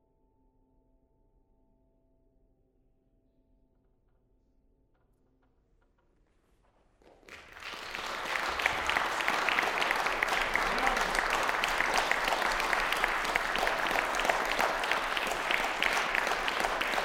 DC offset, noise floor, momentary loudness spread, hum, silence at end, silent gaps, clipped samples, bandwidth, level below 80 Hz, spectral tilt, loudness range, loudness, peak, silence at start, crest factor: under 0.1%; -70 dBFS; 4 LU; none; 0 s; none; under 0.1%; over 20 kHz; -52 dBFS; -1.5 dB/octave; 8 LU; -29 LUFS; -6 dBFS; 7.25 s; 26 dB